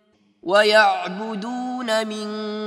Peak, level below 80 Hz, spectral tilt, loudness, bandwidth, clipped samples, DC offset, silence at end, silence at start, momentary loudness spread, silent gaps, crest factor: -2 dBFS; -76 dBFS; -3.5 dB/octave; -20 LUFS; 14.5 kHz; under 0.1%; under 0.1%; 0 s; 0.45 s; 13 LU; none; 18 dB